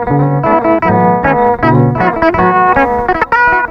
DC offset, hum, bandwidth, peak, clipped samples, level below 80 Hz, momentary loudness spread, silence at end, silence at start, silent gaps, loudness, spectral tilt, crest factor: under 0.1%; none; 6.2 kHz; 0 dBFS; under 0.1%; -32 dBFS; 2 LU; 0 s; 0 s; none; -10 LUFS; -9 dB/octave; 10 dB